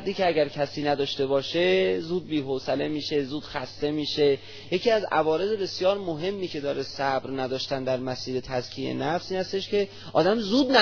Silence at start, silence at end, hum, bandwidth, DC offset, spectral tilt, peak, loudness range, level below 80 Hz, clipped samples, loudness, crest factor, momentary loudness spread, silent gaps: 0 s; 0 s; none; 5.4 kHz; under 0.1%; -5.5 dB/octave; -4 dBFS; 3 LU; -58 dBFS; under 0.1%; -26 LUFS; 22 dB; 7 LU; none